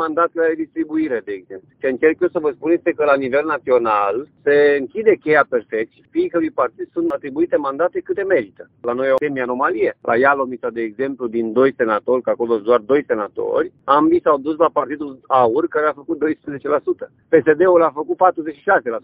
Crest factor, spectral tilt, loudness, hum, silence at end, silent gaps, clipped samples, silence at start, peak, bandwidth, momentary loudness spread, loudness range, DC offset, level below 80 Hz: 18 dB; -8.5 dB/octave; -18 LUFS; none; 0.05 s; none; under 0.1%; 0 s; 0 dBFS; 4.9 kHz; 9 LU; 3 LU; under 0.1%; -60 dBFS